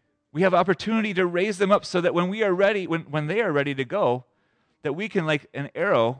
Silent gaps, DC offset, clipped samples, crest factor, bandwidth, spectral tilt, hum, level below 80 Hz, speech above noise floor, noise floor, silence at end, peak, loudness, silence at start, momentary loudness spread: none; under 0.1%; under 0.1%; 16 dB; 10 kHz; -6 dB/octave; none; -68 dBFS; 45 dB; -68 dBFS; 0 s; -8 dBFS; -24 LUFS; 0.35 s; 8 LU